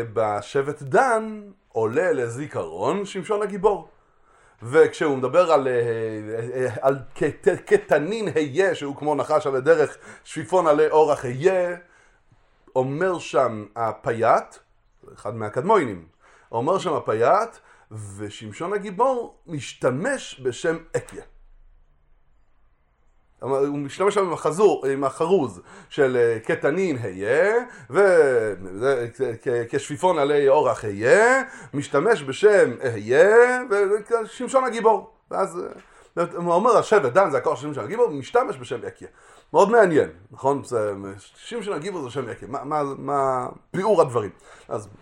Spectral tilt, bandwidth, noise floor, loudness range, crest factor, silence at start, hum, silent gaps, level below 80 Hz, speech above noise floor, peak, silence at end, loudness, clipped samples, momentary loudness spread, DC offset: -5.5 dB/octave; 11.5 kHz; -60 dBFS; 7 LU; 20 dB; 0 s; none; none; -58 dBFS; 38 dB; -2 dBFS; 0.1 s; -22 LUFS; under 0.1%; 14 LU; under 0.1%